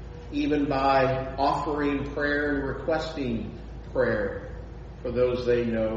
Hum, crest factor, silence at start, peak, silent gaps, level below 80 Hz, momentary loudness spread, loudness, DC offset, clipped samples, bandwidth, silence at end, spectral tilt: none; 16 dB; 0 s; -10 dBFS; none; -42 dBFS; 14 LU; -27 LUFS; under 0.1%; under 0.1%; 7.8 kHz; 0 s; -7 dB/octave